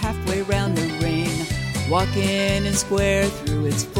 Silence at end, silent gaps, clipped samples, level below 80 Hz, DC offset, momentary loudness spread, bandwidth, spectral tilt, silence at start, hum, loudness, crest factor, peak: 0 s; none; under 0.1%; -34 dBFS; under 0.1%; 4 LU; 16.5 kHz; -5 dB/octave; 0 s; none; -22 LUFS; 14 dB; -8 dBFS